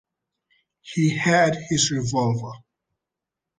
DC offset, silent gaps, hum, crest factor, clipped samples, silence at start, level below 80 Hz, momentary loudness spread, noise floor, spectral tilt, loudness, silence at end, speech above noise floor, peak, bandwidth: under 0.1%; none; none; 20 dB; under 0.1%; 0.85 s; -58 dBFS; 11 LU; -86 dBFS; -4.5 dB/octave; -22 LUFS; 1.05 s; 64 dB; -4 dBFS; 9.8 kHz